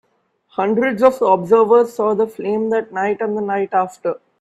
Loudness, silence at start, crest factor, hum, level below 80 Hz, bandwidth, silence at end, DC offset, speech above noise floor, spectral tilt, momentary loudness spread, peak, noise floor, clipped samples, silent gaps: -17 LUFS; 0.6 s; 16 dB; none; -64 dBFS; 12.5 kHz; 0.25 s; under 0.1%; 46 dB; -7 dB/octave; 9 LU; 0 dBFS; -62 dBFS; under 0.1%; none